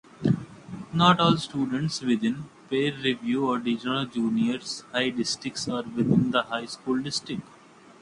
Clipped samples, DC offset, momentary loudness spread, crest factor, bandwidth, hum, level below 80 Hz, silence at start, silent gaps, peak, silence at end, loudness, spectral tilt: under 0.1%; under 0.1%; 10 LU; 22 dB; 11 kHz; none; -60 dBFS; 0.2 s; none; -6 dBFS; 0.6 s; -26 LUFS; -5 dB/octave